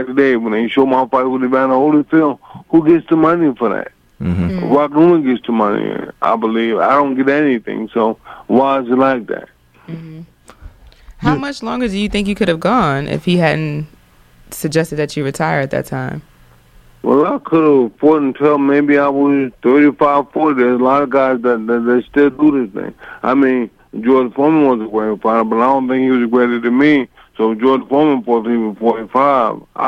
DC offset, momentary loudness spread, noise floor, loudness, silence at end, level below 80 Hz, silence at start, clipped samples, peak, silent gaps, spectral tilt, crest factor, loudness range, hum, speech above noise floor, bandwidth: under 0.1%; 10 LU; -46 dBFS; -14 LUFS; 0 s; -44 dBFS; 0 s; under 0.1%; 0 dBFS; none; -7 dB/octave; 14 dB; 6 LU; none; 33 dB; 14.5 kHz